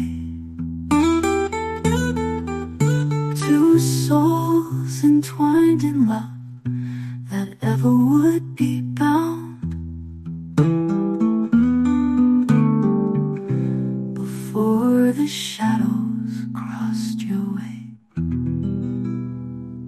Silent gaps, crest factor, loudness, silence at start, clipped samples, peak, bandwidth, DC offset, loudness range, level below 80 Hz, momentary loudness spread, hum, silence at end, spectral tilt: none; 14 dB; -20 LUFS; 0 s; under 0.1%; -6 dBFS; 14 kHz; under 0.1%; 6 LU; -48 dBFS; 13 LU; none; 0 s; -7 dB/octave